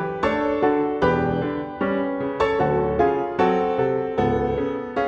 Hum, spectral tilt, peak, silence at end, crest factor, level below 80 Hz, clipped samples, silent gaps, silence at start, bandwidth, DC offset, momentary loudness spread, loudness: none; -8 dB/octave; -6 dBFS; 0 s; 16 dB; -44 dBFS; under 0.1%; none; 0 s; 7.8 kHz; under 0.1%; 5 LU; -22 LUFS